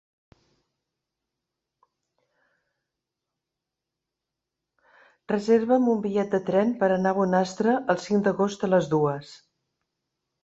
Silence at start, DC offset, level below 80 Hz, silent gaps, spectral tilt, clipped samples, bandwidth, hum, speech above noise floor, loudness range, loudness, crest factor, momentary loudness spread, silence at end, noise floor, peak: 5.3 s; under 0.1%; -68 dBFS; none; -7 dB/octave; under 0.1%; 8 kHz; none; 63 dB; 5 LU; -24 LUFS; 20 dB; 4 LU; 1.1 s; -86 dBFS; -6 dBFS